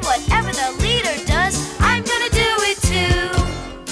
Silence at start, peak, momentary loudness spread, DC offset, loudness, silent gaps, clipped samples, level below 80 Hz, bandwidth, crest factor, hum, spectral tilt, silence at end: 0 s; -4 dBFS; 5 LU; under 0.1%; -18 LUFS; none; under 0.1%; -26 dBFS; 11 kHz; 14 dB; none; -3.5 dB/octave; 0 s